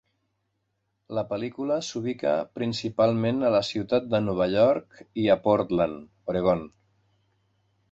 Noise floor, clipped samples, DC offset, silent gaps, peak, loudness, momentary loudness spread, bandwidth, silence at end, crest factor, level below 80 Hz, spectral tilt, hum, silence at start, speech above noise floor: -76 dBFS; under 0.1%; under 0.1%; none; -8 dBFS; -26 LUFS; 9 LU; 8 kHz; 1.25 s; 18 dB; -56 dBFS; -6.5 dB/octave; none; 1.1 s; 51 dB